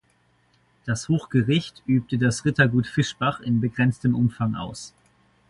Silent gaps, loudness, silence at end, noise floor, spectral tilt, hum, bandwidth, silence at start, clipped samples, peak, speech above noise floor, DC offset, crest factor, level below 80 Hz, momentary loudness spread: none; -23 LUFS; 0.6 s; -64 dBFS; -6 dB/octave; none; 11.5 kHz; 0.85 s; under 0.1%; -4 dBFS; 41 dB; under 0.1%; 20 dB; -52 dBFS; 11 LU